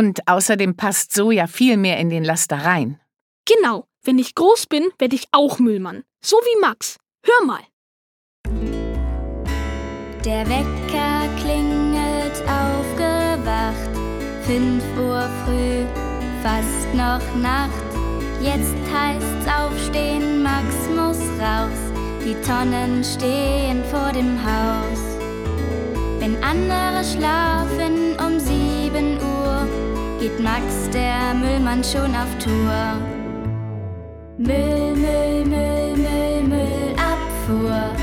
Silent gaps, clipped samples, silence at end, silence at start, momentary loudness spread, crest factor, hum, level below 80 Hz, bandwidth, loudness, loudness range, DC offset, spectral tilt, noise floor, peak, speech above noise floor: 3.21-3.44 s, 7.73-8.44 s; under 0.1%; 0 s; 0 s; 9 LU; 18 dB; none; -28 dBFS; 18.5 kHz; -20 LUFS; 4 LU; under 0.1%; -5 dB/octave; under -90 dBFS; -2 dBFS; over 71 dB